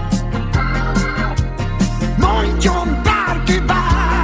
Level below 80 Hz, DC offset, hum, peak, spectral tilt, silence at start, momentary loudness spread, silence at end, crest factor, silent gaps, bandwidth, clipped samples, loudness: -20 dBFS; under 0.1%; none; -2 dBFS; -5.5 dB/octave; 0 s; 4 LU; 0 s; 14 dB; none; 8 kHz; under 0.1%; -17 LUFS